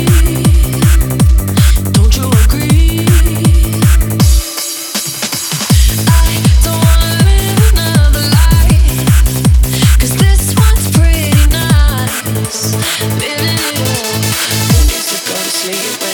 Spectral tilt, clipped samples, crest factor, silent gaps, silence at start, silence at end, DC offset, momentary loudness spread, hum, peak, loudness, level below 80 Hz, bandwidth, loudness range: -4.5 dB/octave; under 0.1%; 8 dB; none; 0 s; 0 s; under 0.1%; 5 LU; none; 0 dBFS; -11 LUFS; -12 dBFS; over 20 kHz; 3 LU